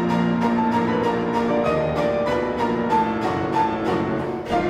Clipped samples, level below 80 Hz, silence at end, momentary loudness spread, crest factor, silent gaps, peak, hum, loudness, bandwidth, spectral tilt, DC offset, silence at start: under 0.1%; -46 dBFS; 0 s; 3 LU; 12 dB; none; -8 dBFS; none; -21 LUFS; 12 kHz; -7 dB/octave; under 0.1%; 0 s